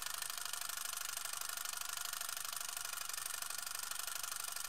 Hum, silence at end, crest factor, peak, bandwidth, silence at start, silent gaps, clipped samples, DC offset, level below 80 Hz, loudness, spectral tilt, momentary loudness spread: none; 0 s; 20 dB; -24 dBFS; 16.5 kHz; 0 s; none; under 0.1%; 0.2%; -78 dBFS; -41 LUFS; 2.5 dB/octave; 1 LU